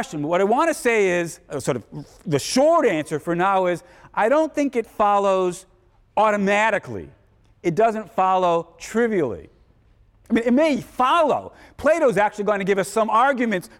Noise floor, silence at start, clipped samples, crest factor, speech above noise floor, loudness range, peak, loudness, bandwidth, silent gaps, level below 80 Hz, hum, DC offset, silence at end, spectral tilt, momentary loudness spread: -56 dBFS; 0 s; under 0.1%; 14 dB; 35 dB; 2 LU; -8 dBFS; -20 LUFS; 16.5 kHz; none; -56 dBFS; none; under 0.1%; 0.15 s; -5 dB/octave; 10 LU